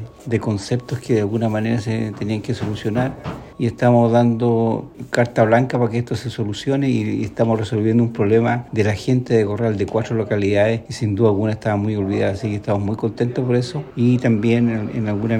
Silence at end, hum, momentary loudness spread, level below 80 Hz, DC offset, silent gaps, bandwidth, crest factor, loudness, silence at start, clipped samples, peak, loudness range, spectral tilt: 0 s; none; 8 LU; -50 dBFS; under 0.1%; none; 10 kHz; 16 dB; -19 LUFS; 0 s; under 0.1%; -2 dBFS; 2 LU; -7.5 dB/octave